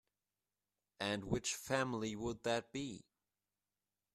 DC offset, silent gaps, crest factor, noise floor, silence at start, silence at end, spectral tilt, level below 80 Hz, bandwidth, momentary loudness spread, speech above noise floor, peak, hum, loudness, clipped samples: under 0.1%; none; 24 dB; under -90 dBFS; 1 s; 1.15 s; -4 dB/octave; -66 dBFS; 14 kHz; 8 LU; over 50 dB; -20 dBFS; 50 Hz at -65 dBFS; -40 LUFS; under 0.1%